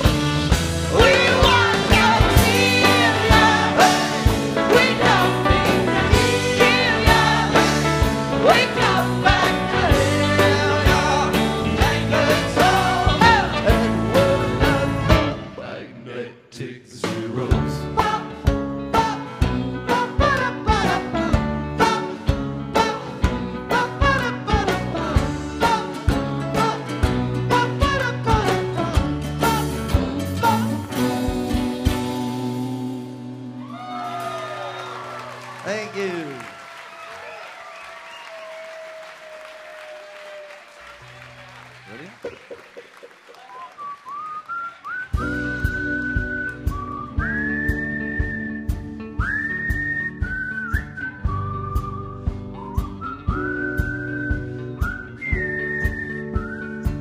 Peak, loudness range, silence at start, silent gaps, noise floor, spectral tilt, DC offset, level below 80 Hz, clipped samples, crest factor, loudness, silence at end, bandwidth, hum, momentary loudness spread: 0 dBFS; 19 LU; 0 s; none; -45 dBFS; -5 dB/octave; under 0.1%; -30 dBFS; under 0.1%; 20 dB; -20 LUFS; 0 s; 15.5 kHz; none; 20 LU